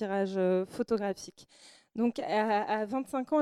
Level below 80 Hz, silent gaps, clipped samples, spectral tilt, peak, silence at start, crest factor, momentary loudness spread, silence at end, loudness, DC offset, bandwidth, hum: -72 dBFS; none; under 0.1%; -6 dB/octave; -14 dBFS; 0 s; 16 dB; 9 LU; 0 s; -31 LUFS; under 0.1%; 13.5 kHz; none